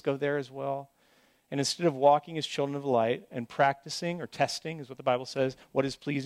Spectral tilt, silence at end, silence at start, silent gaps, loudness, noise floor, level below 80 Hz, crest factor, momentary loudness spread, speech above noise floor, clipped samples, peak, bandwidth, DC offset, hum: -4.5 dB/octave; 0 s; 0.05 s; none; -30 LUFS; -65 dBFS; -70 dBFS; 20 dB; 11 LU; 36 dB; under 0.1%; -10 dBFS; 15 kHz; under 0.1%; none